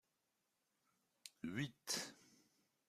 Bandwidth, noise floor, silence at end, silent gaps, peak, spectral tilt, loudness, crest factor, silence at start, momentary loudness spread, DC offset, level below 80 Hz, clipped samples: 15 kHz; -87 dBFS; 0.55 s; none; -24 dBFS; -3 dB/octave; -46 LUFS; 28 dB; 1.25 s; 16 LU; under 0.1%; -84 dBFS; under 0.1%